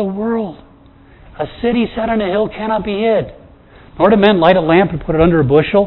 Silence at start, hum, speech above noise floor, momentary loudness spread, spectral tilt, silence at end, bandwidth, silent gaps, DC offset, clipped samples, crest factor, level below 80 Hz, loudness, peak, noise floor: 0 s; none; 30 dB; 11 LU; -10 dB/octave; 0 s; 5.4 kHz; none; under 0.1%; under 0.1%; 14 dB; -36 dBFS; -14 LUFS; 0 dBFS; -43 dBFS